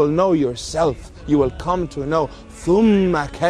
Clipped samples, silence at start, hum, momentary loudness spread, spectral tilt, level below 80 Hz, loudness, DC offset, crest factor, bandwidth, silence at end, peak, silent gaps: under 0.1%; 0 s; none; 8 LU; -6.5 dB/octave; -38 dBFS; -19 LUFS; under 0.1%; 14 dB; 11 kHz; 0 s; -4 dBFS; none